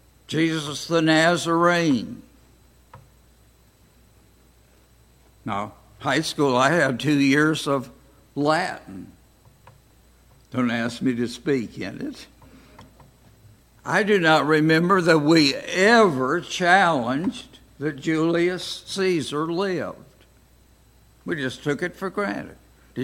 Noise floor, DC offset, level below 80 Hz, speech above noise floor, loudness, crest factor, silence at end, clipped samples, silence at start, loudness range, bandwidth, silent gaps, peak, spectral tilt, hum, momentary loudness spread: -56 dBFS; under 0.1%; -58 dBFS; 35 dB; -21 LUFS; 22 dB; 0 s; under 0.1%; 0.3 s; 11 LU; 16.5 kHz; none; -2 dBFS; -5 dB/octave; none; 17 LU